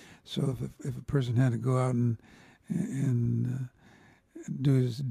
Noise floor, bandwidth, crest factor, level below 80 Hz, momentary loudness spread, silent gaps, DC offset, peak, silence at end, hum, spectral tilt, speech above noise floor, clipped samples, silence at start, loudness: -59 dBFS; 11 kHz; 16 dB; -58 dBFS; 12 LU; none; under 0.1%; -14 dBFS; 0 s; none; -8 dB/octave; 30 dB; under 0.1%; 0 s; -30 LUFS